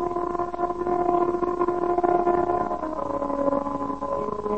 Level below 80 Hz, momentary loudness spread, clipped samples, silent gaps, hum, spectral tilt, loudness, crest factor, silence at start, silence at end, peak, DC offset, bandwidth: -50 dBFS; 6 LU; under 0.1%; none; none; -8.5 dB/octave; -25 LUFS; 18 dB; 0 s; 0 s; -6 dBFS; 0.7%; 8.2 kHz